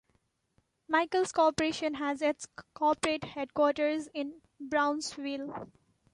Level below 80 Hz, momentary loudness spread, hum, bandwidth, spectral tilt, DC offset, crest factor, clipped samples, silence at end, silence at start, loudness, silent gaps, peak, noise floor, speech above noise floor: -66 dBFS; 14 LU; none; 11.5 kHz; -3.5 dB/octave; under 0.1%; 18 dB; under 0.1%; 0.5 s; 0.9 s; -31 LUFS; none; -14 dBFS; -74 dBFS; 44 dB